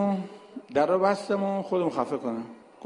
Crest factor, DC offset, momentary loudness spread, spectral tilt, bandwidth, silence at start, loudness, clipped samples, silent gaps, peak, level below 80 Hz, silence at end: 18 dB; under 0.1%; 16 LU; -7 dB/octave; 11 kHz; 0 s; -27 LUFS; under 0.1%; none; -10 dBFS; -70 dBFS; 0 s